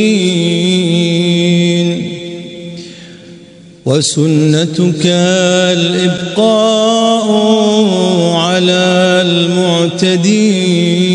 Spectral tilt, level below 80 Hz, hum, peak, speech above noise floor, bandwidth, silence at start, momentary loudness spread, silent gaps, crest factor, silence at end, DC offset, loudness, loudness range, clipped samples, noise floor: -5 dB/octave; -56 dBFS; none; 0 dBFS; 26 dB; 10.5 kHz; 0 s; 9 LU; none; 10 dB; 0 s; under 0.1%; -11 LUFS; 5 LU; under 0.1%; -36 dBFS